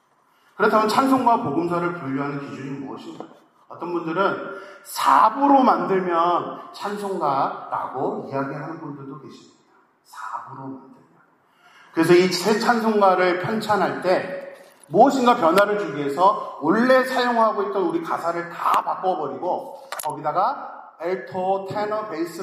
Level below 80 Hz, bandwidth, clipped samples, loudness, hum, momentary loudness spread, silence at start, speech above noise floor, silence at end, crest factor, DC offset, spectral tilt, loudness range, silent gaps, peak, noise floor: -76 dBFS; 15.5 kHz; under 0.1%; -21 LUFS; none; 17 LU; 0.6 s; 39 dB; 0 s; 20 dB; under 0.1%; -5.5 dB/octave; 9 LU; none; -2 dBFS; -60 dBFS